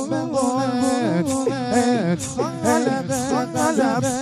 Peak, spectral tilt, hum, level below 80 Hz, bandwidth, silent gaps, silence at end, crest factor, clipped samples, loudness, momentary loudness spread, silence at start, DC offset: -4 dBFS; -5 dB/octave; none; -54 dBFS; 14 kHz; none; 0 s; 16 dB; under 0.1%; -21 LUFS; 4 LU; 0 s; under 0.1%